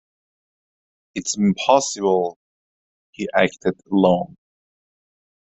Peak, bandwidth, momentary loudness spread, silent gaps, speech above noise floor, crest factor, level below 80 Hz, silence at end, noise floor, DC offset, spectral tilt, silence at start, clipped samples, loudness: -2 dBFS; 8.2 kHz; 12 LU; 2.36-3.13 s; over 71 dB; 22 dB; -62 dBFS; 1.15 s; under -90 dBFS; under 0.1%; -4.5 dB/octave; 1.15 s; under 0.1%; -20 LUFS